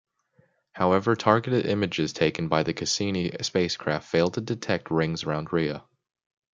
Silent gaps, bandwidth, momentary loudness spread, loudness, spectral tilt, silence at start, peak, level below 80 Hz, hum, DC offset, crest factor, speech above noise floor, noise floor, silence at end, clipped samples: none; 9.4 kHz; 6 LU; -26 LUFS; -5 dB/octave; 0.75 s; -2 dBFS; -60 dBFS; none; under 0.1%; 24 dB; 40 dB; -65 dBFS; 0.75 s; under 0.1%